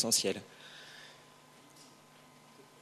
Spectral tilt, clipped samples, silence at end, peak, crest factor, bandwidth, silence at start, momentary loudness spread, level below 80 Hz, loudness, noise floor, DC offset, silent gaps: -1.5 dB/octave; under 0.1%; 1 s; -16 dBFS; 24 dB; 13 kHz; 0 s; 27 LU; -84 dBFS; -32 LUFS; -59 dBFS; under 0.1%; none